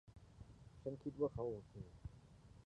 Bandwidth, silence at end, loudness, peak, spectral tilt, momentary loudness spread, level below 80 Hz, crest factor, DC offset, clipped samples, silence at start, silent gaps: 10 kHz; 0 s; -47 LUFS; -28 dBFS; -9.5 dB/octave; 22 LU; -64 dBFS; 22 dB; under 0.1%; under 0.1%; 0.05 s; none